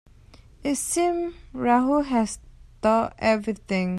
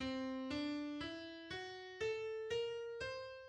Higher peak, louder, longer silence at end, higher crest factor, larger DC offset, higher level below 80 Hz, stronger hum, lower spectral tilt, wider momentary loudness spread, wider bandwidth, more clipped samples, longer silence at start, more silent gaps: first, -8 dBFS vs -30 dBFS; first, -24 LUFS vs -44 LUFS; about the same, 0 s vs 0 s; about the same, 18 dB vs 14 dB; neither; first, -50 dBFS vs -68 dBFS; neither; about the same, -5 dB/octave vs -4.5 dB/octave; first, 9 LU vs 6 LU; first, 14.5 kHz vs 10 kHz; neither; first, 0.6 s vs 0 s; neither